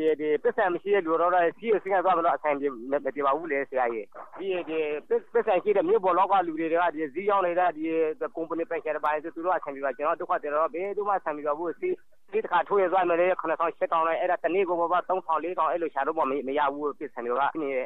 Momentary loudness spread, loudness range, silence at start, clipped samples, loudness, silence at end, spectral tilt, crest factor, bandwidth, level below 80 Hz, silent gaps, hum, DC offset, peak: 7 LU; 3 LU; 0 s; under 0.1%; -27 LUFS; 0 s; -7.5 dB/octave; 12 dB; 4.1 kHz; -76 dBFS; none; none; 0.3%; -14 dBFS